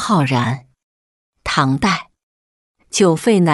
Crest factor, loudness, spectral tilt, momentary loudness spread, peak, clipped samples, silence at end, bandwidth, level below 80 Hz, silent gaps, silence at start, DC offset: 16 dB; -17 LUFS; -5 dB/octave; 9 LU; -2 dBFS; under 0.1%; 0 s; 12 kHz; -48 dBFS; 0.83-1.33 s, 2.23-2.75 s; 0 s; under 0.1%